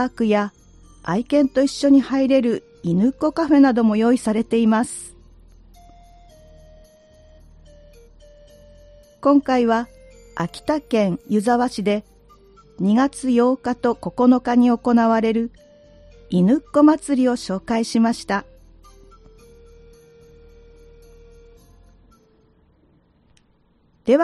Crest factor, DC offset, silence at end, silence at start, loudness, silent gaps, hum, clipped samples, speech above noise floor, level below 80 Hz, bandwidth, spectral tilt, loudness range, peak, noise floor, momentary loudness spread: 18 dB; under 0.1%; 0 s; 0 s; -19 LUFS; none; none; under 0.1%; 42 dB; -50 dBFS; 12 kHz; -6.5 dB/octave; 8 LU; -4 dBFS; -59 dBFS; 10 LU